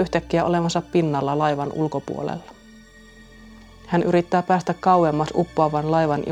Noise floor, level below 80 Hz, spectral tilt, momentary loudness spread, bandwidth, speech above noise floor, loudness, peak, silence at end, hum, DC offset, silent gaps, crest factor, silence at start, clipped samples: -47 dBFS; -50 dBFS; -7 dB/octave; 8 LU; 9.8 kHz; 26 dB; -21 LUFS; -4 dBFS; 0 s; none; under 0.1%; none; 18 dB; 0 s; under 0.1%